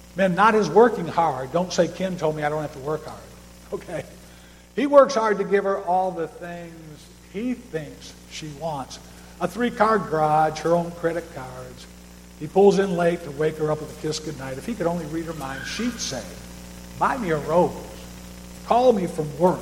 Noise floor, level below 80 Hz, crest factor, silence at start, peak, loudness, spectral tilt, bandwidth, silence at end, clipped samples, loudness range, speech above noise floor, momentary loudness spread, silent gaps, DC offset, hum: -47 dBFS; -48 dBFS; 22 dB; 0.05 s; -2 dBFS; -23 LUFS; -5.5 dB/octave; 16.5 kHz; 0 s; under 0.1%; 6 LU; 24 dB; 22 LU; none; under 0.1%; 60 Hz at -45 dBFS